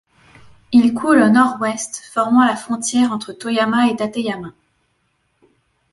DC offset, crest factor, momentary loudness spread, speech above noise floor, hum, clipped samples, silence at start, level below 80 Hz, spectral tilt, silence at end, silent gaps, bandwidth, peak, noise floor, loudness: under 0.1%; 16 dB; 12 LU; 50 dB; none; under 0.1%; 0.7 s; -58 dBFS; -4 dB/octave; 1.4 s; none; 11.5 kHz; -2 dBFS; -66 dBFS; -17 LUFS